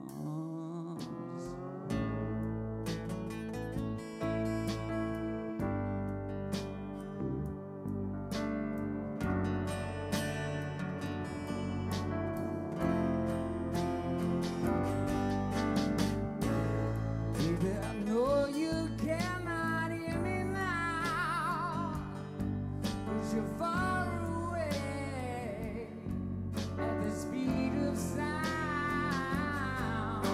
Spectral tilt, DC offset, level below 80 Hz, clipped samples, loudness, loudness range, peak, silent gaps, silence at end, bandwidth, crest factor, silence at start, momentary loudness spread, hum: -6.5 dB/octave; under 0.1%; -50 dBFS; under 0.1%; -35 LUFS; 5 LU; -18 dBFS; none; 0 s; 16 kHz; 16 dB; 0 s; 7 LU; none